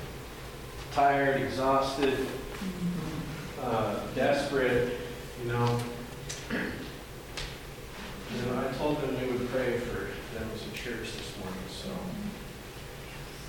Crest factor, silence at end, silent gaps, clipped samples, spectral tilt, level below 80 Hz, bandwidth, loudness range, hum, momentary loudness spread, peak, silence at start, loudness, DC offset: 18 dB; 0 s; none; under 0.1%; -5.5 dB/octave; -48 dBFS; 19 kHz; 6 LU; none; 15 LU; -14 dBFS; 0 s; -32 LUFS; under 0.1%